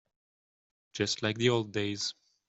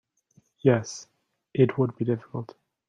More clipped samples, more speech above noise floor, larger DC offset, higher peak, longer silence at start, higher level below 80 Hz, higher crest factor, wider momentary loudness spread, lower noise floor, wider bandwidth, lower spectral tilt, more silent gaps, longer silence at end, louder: neither; first, over 59 dB vs 40 dB; neither; second, -14 dBFS vs -6 dBFS; first, 0.95 s vs 0.65 s; second, -72 dBFS vs -66 dBFS; about the same, 20 dB vs 22 dB; second, 8 LU vs 16 LU; first, under -90 dBFS vs -64 dBFS; about the same, 8.2 kHz vs 7.8 kHz; second, -4 dB/octave vs -7 dB/octave; neither; about the same, 0.35 s vs 0.45 s; second, -31 LUFS vs -26 LUFS